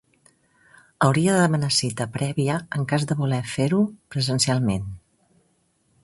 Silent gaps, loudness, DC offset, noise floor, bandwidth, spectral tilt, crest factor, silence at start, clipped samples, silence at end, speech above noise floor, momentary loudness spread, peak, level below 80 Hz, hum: none; -22 LUFS; under 0.1%; -66 dBFS; 11.5 kHz; -5 dB/octave; 20 dB; 1 s; under 0.1%; 1.05 s; 44 dB; 8 LU; -4 dBFS; -52 dBFS; none